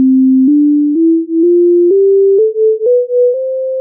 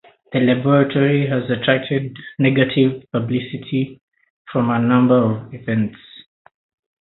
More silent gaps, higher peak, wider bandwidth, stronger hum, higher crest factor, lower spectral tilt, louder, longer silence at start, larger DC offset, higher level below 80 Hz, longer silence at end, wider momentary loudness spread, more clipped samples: second, none vs 4.01-4.08 s, 4.30-4.45 s; second, -4 dBFS vs 0 dBFS; second, 0.7 kHz vs 4.1 kHz; neither; second, 4 dB vs 18 dB; first, -15 dB/octave vs -12 dB/octave; first, -10 LUFS vs -18 LUFS; second, 0 s vs 0.3 s; neither; second, -74 dBFS vs -58 dBFS; second, 0 s vs 0.8 s; second, 3 LU vs 10 LU; neither